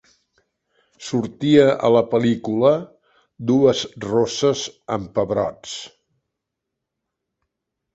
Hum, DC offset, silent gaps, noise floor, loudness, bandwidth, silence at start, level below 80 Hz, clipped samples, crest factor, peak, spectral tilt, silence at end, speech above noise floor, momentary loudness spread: none; under 0.1%; none; -81 dBFS; -19 LUFS; 8.2 kHz; 1 s; -56 dBFS; under 0.1%; 20 dB; -2 dBFS; -5.5 dB/octave; 2.05 s; 63 dB; 14 LU